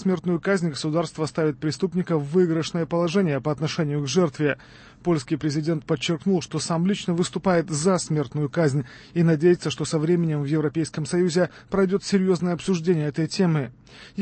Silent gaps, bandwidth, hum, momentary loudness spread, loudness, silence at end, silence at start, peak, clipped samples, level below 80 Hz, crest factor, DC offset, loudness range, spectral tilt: none; 8.8 kHz; none; 5 LU; -24 LUFS; 0 s; 0 s; -8 dBFS; under 0.1%; -56 dBFS; 14 dB; under 0.1%; 2 LU; -6 dB/octave